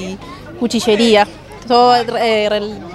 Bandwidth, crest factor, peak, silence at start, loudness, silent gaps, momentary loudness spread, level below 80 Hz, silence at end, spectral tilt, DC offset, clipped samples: 13.5 kHz; 14 dB; 0 dBFS; 0 s; -14 LUFS; none; 18 LU; -46 dBFS; 0 s; -4 dB/octave; under 0.1%; under 0.1%